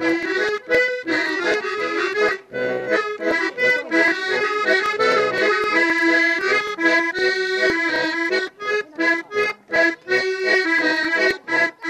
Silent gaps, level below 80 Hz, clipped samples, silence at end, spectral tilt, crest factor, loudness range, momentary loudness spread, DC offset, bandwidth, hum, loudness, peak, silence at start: none; -60 dBFS; under 0.1%; 0 s; -3 dB/octave; 14 dB; 3 LU; 5 LU; under 0.1%; 14 kHz; none; -19 LUFS; -6 dBFS; 0 s